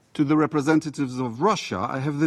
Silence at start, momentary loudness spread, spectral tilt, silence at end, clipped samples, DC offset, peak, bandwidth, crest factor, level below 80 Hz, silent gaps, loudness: 0.15 s; 7 LU; -6.5 dB/octave; 0 s; under 0.1%; under 0.1%; -8 dBFS; 11.5 kHz; 16 dB; -62 dBFS; none; -23 LUFS